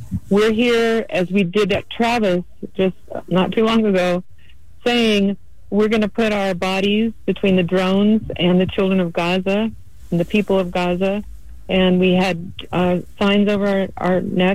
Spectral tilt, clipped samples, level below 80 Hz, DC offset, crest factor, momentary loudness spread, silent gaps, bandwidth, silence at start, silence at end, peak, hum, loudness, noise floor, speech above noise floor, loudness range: -6.5 dB/octave; under 0.1%; -44 dBFS; 2%; 12 dB; 6 LU; none; 13.5 kHz; 0 s; 0 s; -6 dBFS; none; -18 LUFS; -48 dBFS; 30 dB; 2 LU